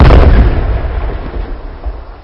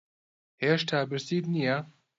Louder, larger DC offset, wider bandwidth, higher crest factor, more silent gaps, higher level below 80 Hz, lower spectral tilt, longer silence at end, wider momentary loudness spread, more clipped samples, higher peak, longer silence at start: first, -12 LUFS vs -29 LUFS; neither; second, 5.8 kHz vs 7.8 kHz; second, 8 dB vs 18 dB; neither; first, -10 dBFS vs -74 dBFS; first, -9 dB/octave vs -6 dB/octave; second, 0.05 s vs 0.3 s; first, 19 LU vs 5 LU; first, 3% vs under 0.1%; first, 0 dBFS vs -12 dBFS; second, 0 s vs 0.6 s